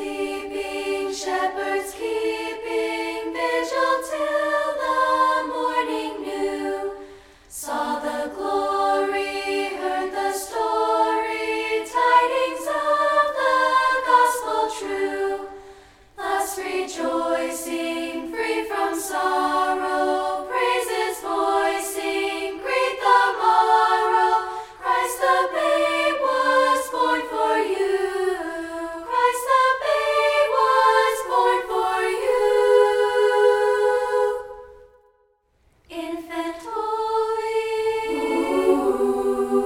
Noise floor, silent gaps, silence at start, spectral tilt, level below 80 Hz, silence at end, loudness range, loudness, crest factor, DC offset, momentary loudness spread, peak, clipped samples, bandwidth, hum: -64 dBFS; none; 0 s; -2 dB/octave; -56 dBFS; 0 s; 7 LU; -22 LUFS; 16 dB; under 0.1%; 10 LU; -6 dBFS; under 0.1%; 17 kHz; none